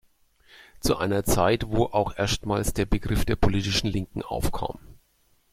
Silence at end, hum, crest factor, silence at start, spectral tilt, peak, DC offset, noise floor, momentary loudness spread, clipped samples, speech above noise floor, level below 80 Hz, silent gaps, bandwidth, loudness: 0.55 s; none; 20 dB; 0.85 s; -5 dB/octave; -6 dBFS; under 0.1%; -65 dBFS; 8 LU; under 0.1%; 41 dB; -36 dBFS; none; 16 kHz; -26 LUFS